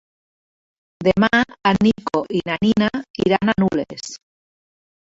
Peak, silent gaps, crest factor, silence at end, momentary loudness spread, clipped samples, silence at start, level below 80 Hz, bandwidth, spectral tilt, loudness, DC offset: -2 dBFS; 3.10-3.14 s; 18 dB; 0.95 s; 12 LU; under 0.1%; 1 s; -48 dBFS; 8 kHz; -6 dB/octave; -19 LUFS; under 0.1%